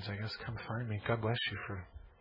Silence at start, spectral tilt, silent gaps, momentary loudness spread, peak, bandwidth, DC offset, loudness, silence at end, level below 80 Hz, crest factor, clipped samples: 0 s; -7.5 dB/octave; none; 10 LU; -18 dBFS; 5.6 kHz; under 0.1%; -38 LUFS; 0.1 s; -60 dBFS; 20 dB; under 0.1%